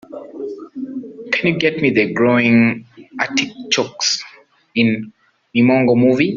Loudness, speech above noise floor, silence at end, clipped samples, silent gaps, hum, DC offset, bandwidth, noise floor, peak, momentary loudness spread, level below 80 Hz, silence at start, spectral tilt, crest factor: -16 LUFS; 30 dB; 0 s; under 0.1%; none; none; under 0.1%; 7.6 kHz; -45 dBFS; -2 dBFS; 17 LU; -58 dBFS; 0.1 s; -4.5 dB/octave; 16 dB